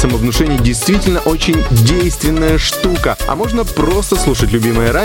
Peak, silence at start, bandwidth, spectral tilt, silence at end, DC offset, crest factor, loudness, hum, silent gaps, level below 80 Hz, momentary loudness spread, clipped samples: 0 dBFS; 0 s; 17 kHz; -5 dB/octave; 0 s; 0.2%; 12 dB; -13 LUFS; none; none; -20 dBFS; 4 LU; under 0.1%